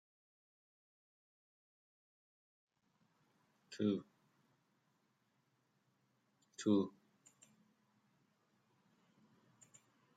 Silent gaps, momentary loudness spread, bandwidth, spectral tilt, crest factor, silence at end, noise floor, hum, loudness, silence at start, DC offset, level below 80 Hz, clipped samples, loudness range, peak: none; 19 LU; 9.2 kHz; -6.5 dB/octave; 26 dB; 3.3 s; -81 dBFS; none; -39 LUFS; 3.7 s; under 0.1%; under -90 dBFS; under 0.1%; 3 LU; -22 dBFS